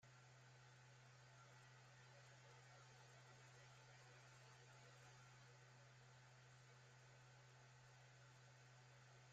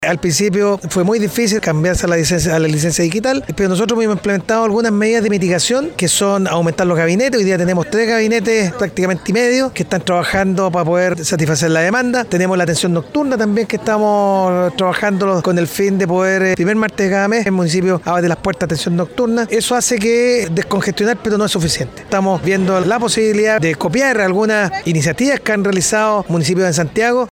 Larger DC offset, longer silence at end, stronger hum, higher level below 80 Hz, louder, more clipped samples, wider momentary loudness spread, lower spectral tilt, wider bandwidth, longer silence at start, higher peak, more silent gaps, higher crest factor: neither; about the same, 0 s vs 0 s; neither; second, under -90 dBFS vs -42 dBFS; second, -67 LUFS vs -15 LUFS; neither; about the same, 2 LU vs 3 LU; about the same, -3.5 dB/octave vs -4.5 dB/octave; second, 8.8 kHz vs 17.5 kHz; about the same, 0 s vs 0 s; second, -54 dBFS vs -2 dBFS; neither; about the same, 12 dB vs 12 dB